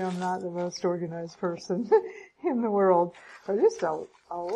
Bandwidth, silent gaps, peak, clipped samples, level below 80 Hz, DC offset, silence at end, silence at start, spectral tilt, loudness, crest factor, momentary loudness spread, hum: 10 kHz; none; -10 dBFS; under 0.1%; -72 dBFS; under 0.1%; 0 s; 0 s; -6.5 dB/octave; -28 LUFS; 18 dB; 13 LU; none